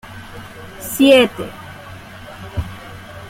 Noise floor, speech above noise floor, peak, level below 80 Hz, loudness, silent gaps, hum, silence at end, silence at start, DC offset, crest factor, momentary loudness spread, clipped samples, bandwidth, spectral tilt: -36 dBFS; 21 dB; 0 dBFS; -42 dBFS; -15 LUFS; none; none; 0 s; 0.1 s; under 0.1%; 18 dB; 25 LU; under 0.1%; 16.5 kHz; -4.5 dB/octave